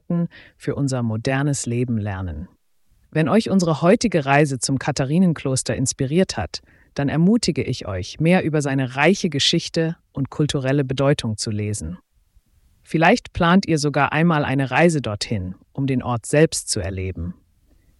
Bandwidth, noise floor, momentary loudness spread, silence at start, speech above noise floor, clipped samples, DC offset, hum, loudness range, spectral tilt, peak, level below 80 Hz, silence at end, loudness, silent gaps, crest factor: 12 kHz; -60 dBFS; 11 LU; 0.1 s; 40 dB; under 0.1%; under 0.1%; none; 3 LU; -5 dB/octave; -4 dBFS; -46 dBFS; 0.65 s; -20 LUFS; none; 16 dB